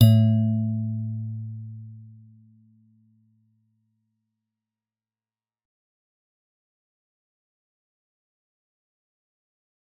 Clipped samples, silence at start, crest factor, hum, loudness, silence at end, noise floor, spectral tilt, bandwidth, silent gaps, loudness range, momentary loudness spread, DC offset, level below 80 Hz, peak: under 0.1%; 0 s; 26 dB; none; -24 LUFS; 7.9 s; under -90 dBFS; -9.5 dB/octave; 5 kHz; none; 22 LU; 23 LU; under 0.1%; -62 dBFS; -2 dBFS